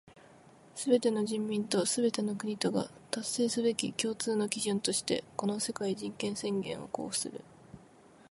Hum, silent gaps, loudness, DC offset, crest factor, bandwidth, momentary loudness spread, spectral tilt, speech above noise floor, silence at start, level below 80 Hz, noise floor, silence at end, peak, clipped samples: none; none; -32 LUFS; under 0.1%; 22 dB; 12 kHz; 8 LU; -4 dB/octave; 26 dB; 0.15 s; -72 dBFS; -58 dBFS; 0.45 s; -10 dBFS; under 0.1%